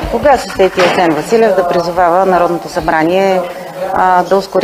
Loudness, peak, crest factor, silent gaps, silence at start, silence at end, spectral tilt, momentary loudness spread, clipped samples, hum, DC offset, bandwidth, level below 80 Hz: -11 LUFS; 0 dBFS; 12 dB; none; 0 s; 0 s; -5 dB/octave; 6 LU; 0.2%; none; under 0.1%; 16 kHz; -36 dBFS